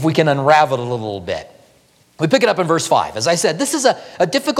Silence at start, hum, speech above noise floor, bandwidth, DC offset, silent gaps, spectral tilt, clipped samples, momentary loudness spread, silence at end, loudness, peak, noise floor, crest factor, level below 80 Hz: 0 s; none; 37 dB; 16 kHz; under 0.1%; none; -4 dB/octave; under 0.1%; 11 LU; 0 s; -16 LUFS; 0 dBFS; -54 dBFS; 16 dB; -58 dBFS